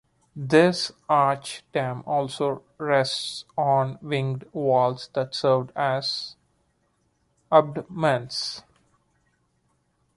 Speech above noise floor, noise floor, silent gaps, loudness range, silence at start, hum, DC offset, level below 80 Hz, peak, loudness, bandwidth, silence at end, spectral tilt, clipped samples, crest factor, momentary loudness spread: 46 dB; -69 dBFS; none; 4 LU; 0.35 s; none; under 0.1%; -66 dBFS; -4 dBFS; -24 LUFS; 11.5 kHz; 1.55 s; -5 dB/octave; under 0.1%; 22 dB; 11 LU